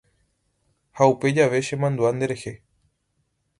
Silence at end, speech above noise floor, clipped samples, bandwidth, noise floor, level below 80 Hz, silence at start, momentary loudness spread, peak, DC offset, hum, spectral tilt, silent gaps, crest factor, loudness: 1.05 s; 51 dB; under 0.1%; 11.5 kHz; -72 dBFS; -62 dBFS; 0.95 s; 10 LU; -2 dBFS; under 0.1%; none; -6 dB/octave; none; 22 dB; -22 LUFS